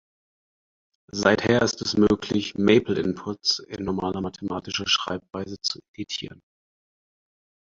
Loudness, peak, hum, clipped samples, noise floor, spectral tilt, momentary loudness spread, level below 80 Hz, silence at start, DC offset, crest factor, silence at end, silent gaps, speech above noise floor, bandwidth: -24 LUFS; -2 dBFS; none; under 0.1%; under -90 dBFS; -4.5 dB/octave; 12 LU; -52 dBFS; 1.15 s; under 0.1%; 24 dB; 1.4 s; 5.88-5.94 s; over 66 dB; 7.6 kHz